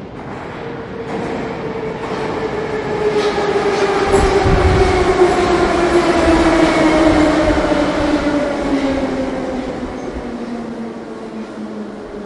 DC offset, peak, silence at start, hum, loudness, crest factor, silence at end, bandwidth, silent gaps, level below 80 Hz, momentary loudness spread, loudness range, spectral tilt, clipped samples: under 0.1%; 0 dBFS; 0 s; none; -16 LUFS; 16 dB; 0 s; 11.5 kHz; none; -28 dBFS; 15 LU; 9 LU; -6 dB/octave; under 0.1%